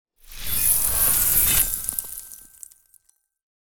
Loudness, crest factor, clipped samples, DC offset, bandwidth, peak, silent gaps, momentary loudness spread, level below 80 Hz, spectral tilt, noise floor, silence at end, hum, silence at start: -18 LUFS; 20 dB; under 0.1%; under 0.1%; over 20 kHz; -4 dBFS; none; 20 LU; -40 dBFS; -0.5 dB/octave; -61 dBFS; 0.2 s; none; 0.05 s